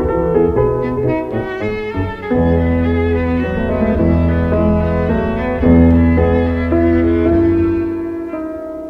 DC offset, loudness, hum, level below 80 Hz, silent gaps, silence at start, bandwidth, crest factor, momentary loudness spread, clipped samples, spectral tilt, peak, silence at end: under 0.1%; -15 LUFS; none; -28 dBFS; none; 0 s; 5.2 kHz; 14 dB; 9 LU; under 0.1%; -10.5 dB/octave; 0 dBFS; 0 s